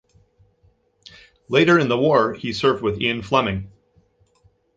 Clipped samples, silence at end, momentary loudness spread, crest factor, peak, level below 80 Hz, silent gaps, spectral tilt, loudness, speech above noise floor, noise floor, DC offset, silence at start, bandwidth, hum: under 0.1%; 1.1 s; 9 LU; 20 dB; -2 dBFS; -50 dBFS; none; -6 dB/octave; -19 LUFS; 42 dB; -61 dBFS; under 0.1%; 1.5 s; 7.8 kHz; none